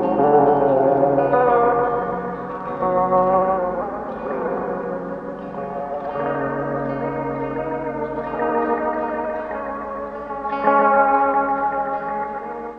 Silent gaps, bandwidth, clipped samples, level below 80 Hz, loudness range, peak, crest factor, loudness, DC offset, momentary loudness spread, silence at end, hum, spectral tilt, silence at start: none; 5 kHz; under 0.1%; -50 dBFS; 7 LU; -2 dBFS; 18 dB; -21 LUFS; under 0.1%; 12 LU; 0 s; none; -9.5 dB/octave; 0 s